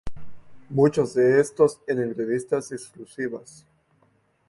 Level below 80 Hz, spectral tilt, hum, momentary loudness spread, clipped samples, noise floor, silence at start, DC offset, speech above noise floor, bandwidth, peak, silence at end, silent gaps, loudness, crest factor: -52 dBFS; -6.5 dB/octave; none; 18 LU; under 0.1%; -64 dBFS; 0.05 s; under 0.1%; 41 dB; 11.5 kHz; -6 dBFS; 1.1 s; none; -23 LUFS; 18 dB